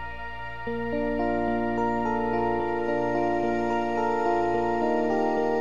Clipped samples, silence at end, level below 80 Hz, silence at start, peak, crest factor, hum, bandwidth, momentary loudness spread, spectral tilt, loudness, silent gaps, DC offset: under 0.1%; 0 s; -48 dBFS; 0 s; -12 dBFS; 14 dB; none; 7.4 kHz; 7 LU; -7 dB/octave; -26 LUFS; none; 1%